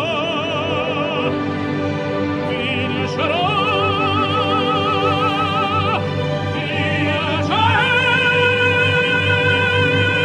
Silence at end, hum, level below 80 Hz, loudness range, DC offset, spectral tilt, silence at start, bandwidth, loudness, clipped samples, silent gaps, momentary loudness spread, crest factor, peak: 0 s; none; -50 dBFS; 4 LU; under 0.1%; -6 dB/octave; 0 s; 10.5 kHz; -17 LUFS; under 0.1%; none; 7 LU; 14 dB; -4 dBFS